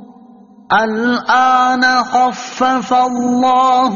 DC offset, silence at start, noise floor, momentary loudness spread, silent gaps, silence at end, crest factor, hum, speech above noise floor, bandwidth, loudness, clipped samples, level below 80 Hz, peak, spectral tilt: under 0.1%; 0 s; -41 dBFS; 5 LU; none; 0 s; 12 dB; none; 29 dB; 7.4 kHz; -13 LUFS; under 0.1%; -56 dBFS; -2 dBFS; -1.5 dB/octave